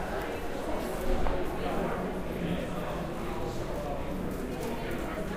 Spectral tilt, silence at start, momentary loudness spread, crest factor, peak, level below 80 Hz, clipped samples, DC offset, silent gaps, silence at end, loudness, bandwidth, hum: -6 dB/octave; 0 s; 3 LU; 16 dB; -16 dBFS; -38 dBFS; under 0.1%; under 0.1%; none; 0 s; -34 LUFS; 16 kHz; none